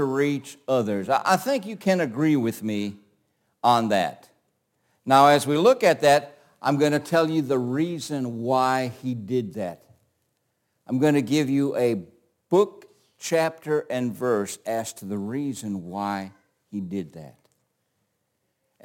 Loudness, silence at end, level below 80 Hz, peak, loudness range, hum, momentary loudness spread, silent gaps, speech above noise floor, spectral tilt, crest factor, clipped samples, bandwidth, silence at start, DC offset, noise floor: -24 LUFS; 1.55 s; -72 dBFS; -4 dBFS; 9 LU; none; 13 LU; none; 52 dB; -5.5 dB/octave; 22 dB; under 0.1%; 17 kHz; 0 s; under 0.1%; -75 dBFS